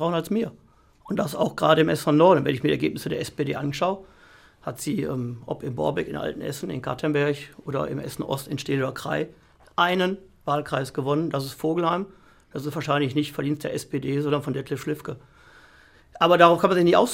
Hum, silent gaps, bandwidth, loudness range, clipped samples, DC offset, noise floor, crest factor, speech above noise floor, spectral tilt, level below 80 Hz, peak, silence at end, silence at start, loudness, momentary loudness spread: none; none; 16.5 kHz; 6 LU; under 0.1%; under 0.1%; -54 dBFS; 24 dB; 30 dB; -6 dB/octave; -58 dBFS; -2 dBFS; 0 s; 0 s; -24 LUFS; 14 LU